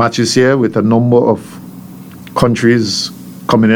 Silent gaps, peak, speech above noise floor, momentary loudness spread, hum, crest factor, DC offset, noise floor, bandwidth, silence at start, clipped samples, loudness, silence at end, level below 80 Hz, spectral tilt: none; 0 dBFS; 21 dB; 21 LU; none; 12 dB; under 0.1%; -32 dBFS; 19 kHz; 0 s; under 0.1%; -12 LUFS; 0 s; -44 dBFS; -5.5 dB/octave